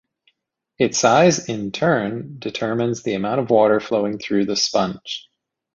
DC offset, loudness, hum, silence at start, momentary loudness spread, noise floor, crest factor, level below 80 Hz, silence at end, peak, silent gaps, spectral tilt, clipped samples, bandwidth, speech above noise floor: under 0.1%; -19 LUFS; none; 0.8 s; 13 LU; -71 dBFS; 18 dB; -58 dBFS; 0.55 s; -2 dBFS; none; -4.5 dB/octave; under 0.1%; 7.8 kHz; 52 dB